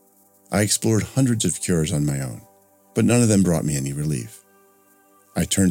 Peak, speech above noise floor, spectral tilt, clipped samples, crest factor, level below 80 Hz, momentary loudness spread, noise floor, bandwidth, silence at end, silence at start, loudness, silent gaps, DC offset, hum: -4 dBFS; 36 dB; -5 dB/octave; under 0.1%; 18 dB; -48 dBFS; 12 LU; -56 dBFS; 17 kHz; 0 s; 0.5 s; -21 LUFS; none; under 0.1%; none